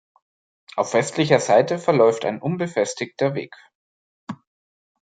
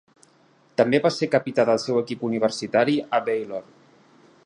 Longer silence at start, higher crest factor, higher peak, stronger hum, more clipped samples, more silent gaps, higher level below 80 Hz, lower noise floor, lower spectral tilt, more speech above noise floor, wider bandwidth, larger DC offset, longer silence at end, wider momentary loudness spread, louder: about the same, 0.75 s vs 0.8 s; about the same, 20 dB vs 20 dB; about the same, -2 dBFS vs -4 dBFS; neither; neither; first, 3.75-4.27 s vs none; about the same, -68 dBFS vs -70 dBFS; first, under -90 dBFS vs -58 dBFS; about the same, -5 dB/octave vs -5.5 dB/octave; first, over 70 dB vs 36 dB; second, 9.4 kHz vs 10.5 kHz; neither; second, 0.7 s vs 0.85 s; first, 21 LU vs 8 LU; first, -20 LUFS vs -23 LUFS